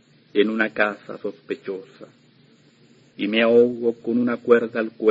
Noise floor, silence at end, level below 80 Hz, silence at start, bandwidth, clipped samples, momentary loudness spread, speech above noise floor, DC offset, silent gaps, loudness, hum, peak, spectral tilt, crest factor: -55 dBFS; 0 s; -70 dBFS; 0.35 s; 7.4 kHz; under 0.1%; 16 LU; 34 dB; under 0.1%; none; -21 LUFS; none; -2 dBFS; -7 dB/octave; 20 dB